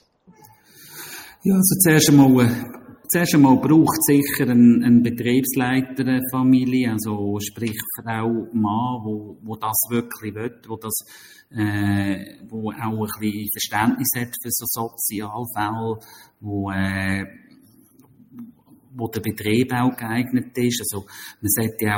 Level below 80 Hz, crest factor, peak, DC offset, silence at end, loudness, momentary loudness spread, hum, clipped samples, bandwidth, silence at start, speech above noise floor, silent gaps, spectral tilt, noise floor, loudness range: -56 dBFS; 20 dB; -2 dBFS; under 0.1%; 0 s; -20 LUFS; 17 LU; none; under 0.1%; 17 kHz; 0.8 s; 33 dB; none; -5 dB/octave; -53 dBFS; 10 LU